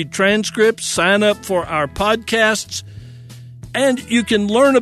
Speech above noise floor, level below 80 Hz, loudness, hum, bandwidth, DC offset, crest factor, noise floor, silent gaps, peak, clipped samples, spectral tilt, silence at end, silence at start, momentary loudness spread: 20 dB; -44 dBFS; -16 LUFS; none; 13.5 kHz; under 0.1%; 16 dB; -37 dBFS; none; -2 dBFS; under 0.1%; -3.5 dB/octave; 0 s; 0 s; 12 LU